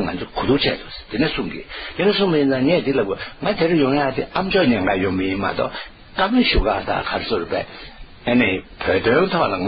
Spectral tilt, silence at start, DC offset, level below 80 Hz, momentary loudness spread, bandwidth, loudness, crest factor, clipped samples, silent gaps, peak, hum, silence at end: -11 dB/octave; 0 s; under 0.1%; -36 dBFS; 12 LU; 5.4 kHz; -20 LUFS; 16 dB; under 0.1%; none; -4 dBFS; none; 0 s